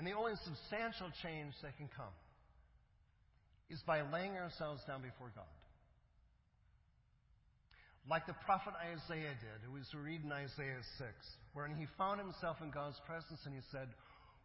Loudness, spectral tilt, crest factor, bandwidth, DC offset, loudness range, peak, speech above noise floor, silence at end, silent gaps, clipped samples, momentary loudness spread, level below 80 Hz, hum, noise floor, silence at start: -46 LUFS; -4 dB/octave; 24 dB; 5.6 kHz; under 0.1%; 6 LU; -22 dBFS; 28 dB; 0.05 s; none; under 0.1%; 15 LU; -68 dBFS; none; -74 dBFS; 0 s